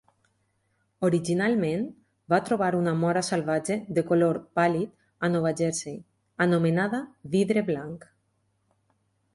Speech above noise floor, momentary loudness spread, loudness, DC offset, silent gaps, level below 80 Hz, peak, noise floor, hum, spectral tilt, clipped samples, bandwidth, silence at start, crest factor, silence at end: 47 dB; 10 LU; -26 LUFS; under 0.1%; none; -66 dBFS; -8 dBFS; -72 dBFS; none; -6 dB/octave; under 0.1%; 11.5 kHz; 1 s; 18 dB; 1.35 s